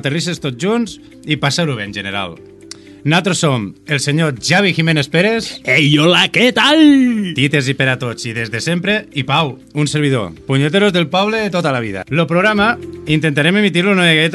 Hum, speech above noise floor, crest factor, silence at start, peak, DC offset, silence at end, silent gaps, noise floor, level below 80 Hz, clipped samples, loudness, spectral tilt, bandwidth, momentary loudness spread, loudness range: none; 22 dB; 14 dB; 0.05 s; 0 dBFS; under 0.1%; 0 s; none; -36 dBFS; -50 dBFS; under 0.1%; -14 LUFS; -5 dB/octave; 12.5 kHz; 11 LU; 6 LU